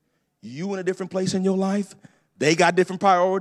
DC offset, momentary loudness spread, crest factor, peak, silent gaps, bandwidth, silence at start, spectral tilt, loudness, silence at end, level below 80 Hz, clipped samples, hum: under 0.1%; 13 LU; 18 dB; -4 dBFS; none; 12 kHz; 0.45 s; -5 dB/octave; -22 LUFS; 0 s; -72 dBFS; under 0.1%; none